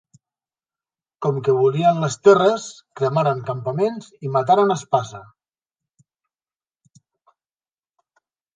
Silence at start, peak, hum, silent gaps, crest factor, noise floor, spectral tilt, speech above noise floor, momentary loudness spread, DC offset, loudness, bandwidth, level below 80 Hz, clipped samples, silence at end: 1.2 s; -2 dBFS; none; none; 20 dB; under -90 dBFS; -6 dB/octave; over 71 dB; 12 LU; under 0.1%; -19 LUFS; 9.4 kHz; -68 dBFS; under 0.1%; 3.35 s